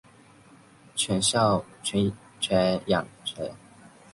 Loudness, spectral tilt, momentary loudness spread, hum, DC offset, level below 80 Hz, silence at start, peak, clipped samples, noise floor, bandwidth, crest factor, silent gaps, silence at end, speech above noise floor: -26 LUFS; -4 dB/octave; 12 LU; none; under 0.1%; -56 dBFS; 0.95 s; -8 dBFS; under 0.1%; -54 dBFS; 11.5 kHz; 20 dB; none; 0.25 s; 29 dB